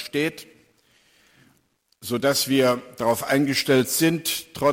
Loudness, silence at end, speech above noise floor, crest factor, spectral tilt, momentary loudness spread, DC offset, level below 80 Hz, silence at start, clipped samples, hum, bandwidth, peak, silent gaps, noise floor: -22 LUFS; 0 s; 44 dB; 16 dB; -4 dB/octave; 9 LU; under 0.1%; -62 dBFS; 0 s; under 0.1%; none; 17 kHz; -8 dBFS; none; -66 dBFS